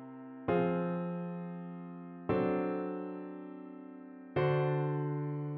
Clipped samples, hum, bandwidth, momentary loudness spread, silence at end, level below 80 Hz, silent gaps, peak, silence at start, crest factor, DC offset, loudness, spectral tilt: under 0.1%; none; 4.5 kHz; 16 LU; 0 s; -68 dBFS; none; -20 dBFS; 0 s; 16 dB; under 0.1%; -35 LUFS; -7.5 dB/octave